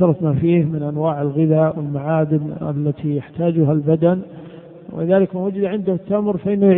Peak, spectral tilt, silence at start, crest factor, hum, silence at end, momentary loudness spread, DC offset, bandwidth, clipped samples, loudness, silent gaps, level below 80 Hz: -2 dBFS; -14 dB/octave; 0 s; 16 dB; none; 0 s; 8 LU; under 0.1%; 3.8 kHz; under 0.1%; -19 LUFS; none; -54 dBFS